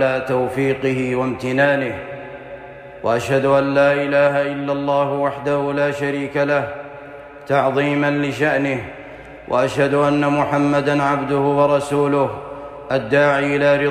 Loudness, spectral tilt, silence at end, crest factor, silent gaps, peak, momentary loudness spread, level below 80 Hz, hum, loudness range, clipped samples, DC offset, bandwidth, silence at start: -18 LUFS; -6.5 dB/octave; 0 s; 14 dB; none; -4 dBFS; 17 LU; -52 dBFS; none; 3 LU; under 0.1%; under 0.1%; 13 kHz; 0 s